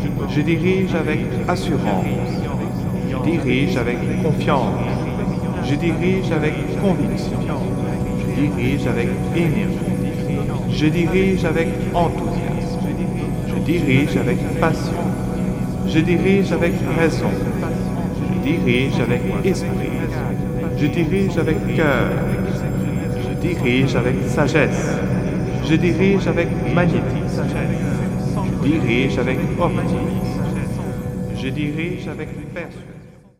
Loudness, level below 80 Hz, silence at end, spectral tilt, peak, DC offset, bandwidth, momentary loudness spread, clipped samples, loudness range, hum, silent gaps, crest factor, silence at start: -20 LUFS; -34 dBFS; 0.3 s; -7 dB/octave; -2 dBFS; under 0.1%; 15.5 kHz; 6 LU; under 0.1%; 2 LU; none; none; 18 dB; 0 s